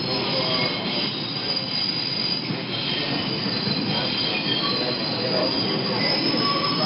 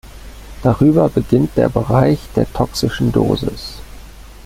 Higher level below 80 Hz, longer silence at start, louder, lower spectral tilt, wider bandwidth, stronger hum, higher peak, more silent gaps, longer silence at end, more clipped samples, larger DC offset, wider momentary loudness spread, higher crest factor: second, -58 dBFS vs -34 dBFS; about the same, 0 s vs 0.05 s; second, -22 LUFS vs -16 LUFS; first, -9.5 dB/octave vs -7.5 dB/octave; second, 5.8 kHz vs 16 kHz; neither; second, -10 dBFS vs -2 dBFS; neither; about the same, 0 s vs 0.1 s; neither; neither; second, 3 LU vs 10 LU; about the same, 14 dB vs 14 dB